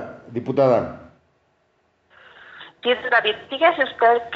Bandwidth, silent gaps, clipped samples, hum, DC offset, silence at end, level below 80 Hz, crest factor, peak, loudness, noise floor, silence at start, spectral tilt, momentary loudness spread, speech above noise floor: 7 kHz; none; under 0.1%; none; under 0.1%; 0 s; -62 dBFS; 18 dB; -4 dBFS; -20 LUFS; -65 dBFS; 0 s; -2 dB/octave; 14 LU; 46 dB